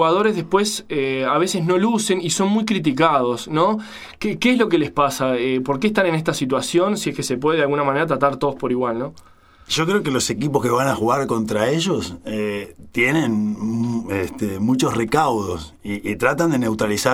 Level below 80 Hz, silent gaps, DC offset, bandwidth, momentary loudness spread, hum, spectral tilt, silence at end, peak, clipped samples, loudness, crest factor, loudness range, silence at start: -50 dBFS; none; under 0.1%; 16.5 kHz; 8 LU; none; -5 dB/octave; 0 s; 0 dBFS; under 0.1%; -20 LUFS; 18 dB; 2 LU; 0 s